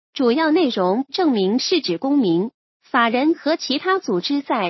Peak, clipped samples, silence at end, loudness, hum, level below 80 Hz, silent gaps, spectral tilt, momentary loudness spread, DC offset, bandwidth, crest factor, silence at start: -4 dBFS; under 0.1%; 0 s; -19 LUFS; none; -74 dBFS; 2.54-2.80 s; -5 dB/octave; 4 LU; under 0.1%; 6.2 kHz; 16 dB; 0.15 s